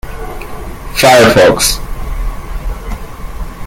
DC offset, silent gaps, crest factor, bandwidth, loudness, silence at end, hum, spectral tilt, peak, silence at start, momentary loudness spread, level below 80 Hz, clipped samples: under 0.1%; none; 12 dB; 17 kHz; -8 LUFS; 0 s; none; -3.5 dB/octave; 0 dBFS; 0.05 s; 22 LU; -22 dBFS; 0.1%